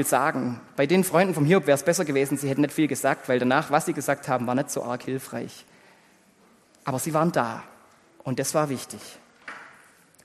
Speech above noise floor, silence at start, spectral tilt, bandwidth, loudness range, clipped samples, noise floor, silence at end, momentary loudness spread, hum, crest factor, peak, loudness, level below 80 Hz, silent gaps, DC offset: 34 dB; 0 s; -5 dB/octave; 13 kHz; 8 LU; under 0.1%; -58 dBFS; 0.55 s; 18 LU; none; 20 dB; -6 dBFS; -24 LUFS; -68 dBFS; none; under 0.1%